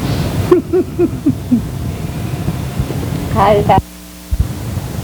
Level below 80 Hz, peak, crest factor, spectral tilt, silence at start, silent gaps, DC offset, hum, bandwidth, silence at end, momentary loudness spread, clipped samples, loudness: -26 dBFS; 0 dBFS; 16 dB; -7 dB/octave; 0 s; none; under 0.1%; none; over 20 kHz; 0 s; 11 LU; 0.1%; -16 LUFS